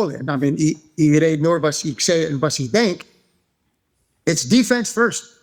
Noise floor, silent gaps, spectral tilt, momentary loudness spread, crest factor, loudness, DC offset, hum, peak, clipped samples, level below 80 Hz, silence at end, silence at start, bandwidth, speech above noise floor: -69 dBFS; none; -4.5 dB/octave; 6 LU; 18 dB; -18 LUFS; under 0.1%; none; -2 dBFS; under 0.1%; -58 dBFS; 0.2 s; 0 s; 19.5 kHz; 51 dB